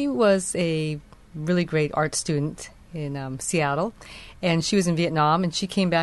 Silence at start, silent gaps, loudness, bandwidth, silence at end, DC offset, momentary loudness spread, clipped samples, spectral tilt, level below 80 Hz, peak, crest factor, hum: 0 s; none; -24 LUFS; 12.5 kHz; 0 s; under 0.1%; 14 LU; under 0.1%; -5 dB/octave; -52 dBFS; -8 dBFS; 16 dB; none